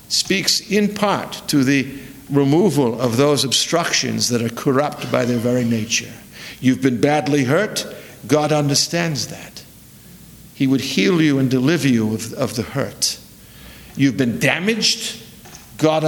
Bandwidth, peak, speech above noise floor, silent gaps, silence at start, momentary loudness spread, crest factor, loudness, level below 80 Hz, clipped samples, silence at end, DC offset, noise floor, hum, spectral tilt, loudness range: 19.5 kHz; 0 dBFS; 25 dB; none; 0.1 s; 13 LU; 18 dB; -18 LUFS; -54 dBFS; under 0.1%; 0 s; under 0.1%; -43 dBFS; none; -4 dB/octave; 3 LU